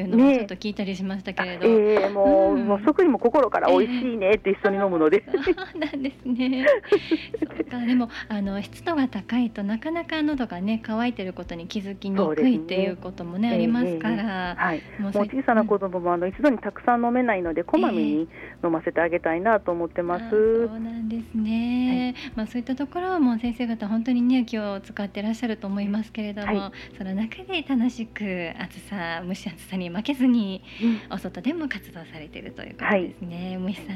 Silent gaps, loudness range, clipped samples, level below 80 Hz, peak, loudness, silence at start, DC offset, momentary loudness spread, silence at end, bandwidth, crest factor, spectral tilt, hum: none; 7 LU; under 0.1%; -52 dBFS; -6 dBFS; -24 LUFS; 0 s; under 0.1%; 12 LU; 0 s; 12 kHz; 18 dB; -7 dB/octave; none